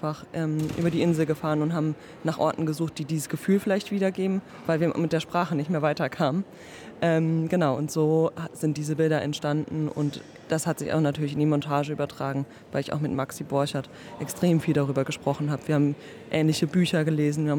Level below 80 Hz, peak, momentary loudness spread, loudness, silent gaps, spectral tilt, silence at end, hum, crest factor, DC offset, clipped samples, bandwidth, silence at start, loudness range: -64 dBFS; -10 dBFS; 7 LU; -26 LUFS; none; -6.5 dB/octave; 0 s; none; 16 dB; under 0.1%; under 0.1%; 18 kHz; 0 s; 2 LU